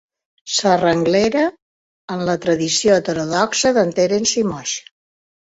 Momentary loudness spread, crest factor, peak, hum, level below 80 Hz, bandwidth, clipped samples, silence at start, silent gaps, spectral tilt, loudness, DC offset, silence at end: 9 LU; 16 dB; -2 dBFS; none; -54 dBFS; 8.2 kHz; under 0.1%; 0.45 s; 1.62-2.08 s; -3.5 dB/octave; -17 LUFS; under 0.1%; 0.8 s